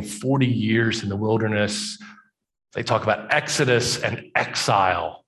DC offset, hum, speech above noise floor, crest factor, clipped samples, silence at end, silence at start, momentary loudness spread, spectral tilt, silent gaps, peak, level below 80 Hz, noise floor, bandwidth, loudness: under 0.1%; none; 29 dB; 18 dB; under 0.1%; 0.1 s; 0 s; 7 LU; -4.5 dB/octave; none; -4 dBFS; -52 dBFS; -51 dBFS; 12.5 kHz; -22 LUFS